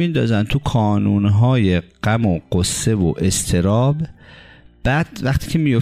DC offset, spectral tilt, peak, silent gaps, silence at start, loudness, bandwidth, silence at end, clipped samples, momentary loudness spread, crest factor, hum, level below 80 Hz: under 0.1%; -6 dB/octave; -6 dBFS; none; 0 s; -18 LUFS; 16 kHz; 0 s; under 0.1%; 5 LU; 12 dB; none; -36 dBFS